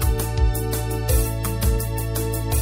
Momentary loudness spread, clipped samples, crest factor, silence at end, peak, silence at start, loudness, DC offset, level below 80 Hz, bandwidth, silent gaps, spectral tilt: 3 LU; under 0.1%; 14 dB; 0 s; -6 dBFS; 0 s; -23 LUFS; under 0.1%; -24 dBFS; 16.5 kHz; none; -5 dB/octave